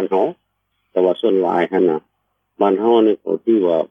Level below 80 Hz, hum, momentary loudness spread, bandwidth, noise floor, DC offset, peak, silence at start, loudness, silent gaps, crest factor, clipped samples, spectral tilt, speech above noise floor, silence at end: -74 dBFS; none; 7 LU; 3.7 kHz; -70 dBFS; under 0.1%; -2 dBFS; 0 s; -17 LUFS; none; 16 dB; under 0.1%; -8.5 dB/octave; 54 dB; 0.05 s